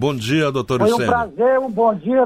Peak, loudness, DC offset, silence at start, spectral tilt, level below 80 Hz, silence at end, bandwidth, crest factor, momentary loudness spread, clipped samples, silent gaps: -6 dBFS; -18 LUFS; under 0.1%; 0 s; -6 dB/octave; -48 dBFS; 0 s; 15.5 kHz; 12 dB; 2 LU; under 0.1%; none